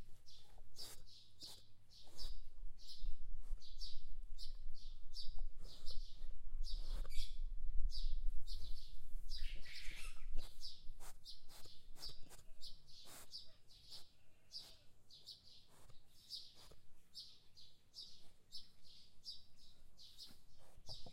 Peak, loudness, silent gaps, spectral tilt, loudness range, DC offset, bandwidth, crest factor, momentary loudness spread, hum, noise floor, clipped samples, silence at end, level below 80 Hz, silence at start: -22 dBFS; -55 LUFS; none; -2.5 dB/octave; 7 LU; under 0.1%; 11 kHz; 16 dB; 13 LU; none; -60 dBFS; under 0.1%; 0 s; -46 dBFS; 0 s